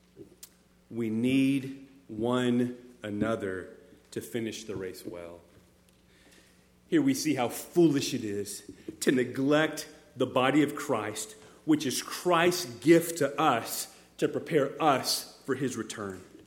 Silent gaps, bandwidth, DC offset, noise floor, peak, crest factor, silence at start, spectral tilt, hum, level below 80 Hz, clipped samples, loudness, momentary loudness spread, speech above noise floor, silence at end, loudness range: none; 18 kHz; under 0.1%; -62 dBFS; -10 dBFS; 20 dB; 0.15 s; -4.5 dB/octave; none; -68 dBFS; under 0.1%; -29 LUFS; 16 LU; 33 dB; 0.1 s; 9 LU